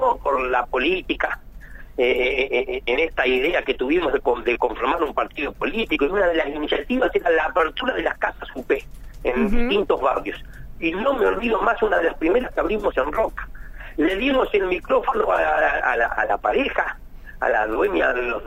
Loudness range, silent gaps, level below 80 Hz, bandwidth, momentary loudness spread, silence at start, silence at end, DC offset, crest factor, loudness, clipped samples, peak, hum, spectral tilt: 2 LU; none; -36 dBFS; 16 kHz; 7 LU; 0 s; 0 s; under 0.1%; 16 dB; -21 LUFS; under 0.1%; -6 dBFS; none; -5.5 dB/octave